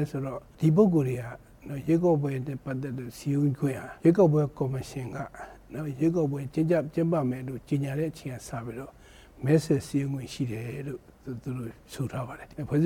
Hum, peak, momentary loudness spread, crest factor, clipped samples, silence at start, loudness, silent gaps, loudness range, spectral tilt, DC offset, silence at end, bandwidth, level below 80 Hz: none; -10 dBFS; 16 LU; 18 dB; under 0.1%; 0 s; -28 LUFS; none; 4 LU; -8 dB/octave; under 0.1%; 0 s; 16.5 kHz; -56 dBFS